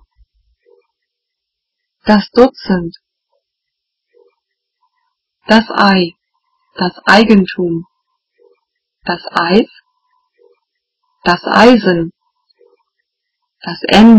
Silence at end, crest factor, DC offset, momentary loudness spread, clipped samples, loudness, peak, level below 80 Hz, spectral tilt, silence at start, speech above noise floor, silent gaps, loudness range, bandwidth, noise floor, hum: 0 s; 14 dB; under 0.1%; 17 LU; 1%; -12 LUFS; 0 dBFS; -44 dBFS; -6 dB/octave; 2.05 s; 67 dB; none; 6 LU; 8 kHz; -77 dBFS; none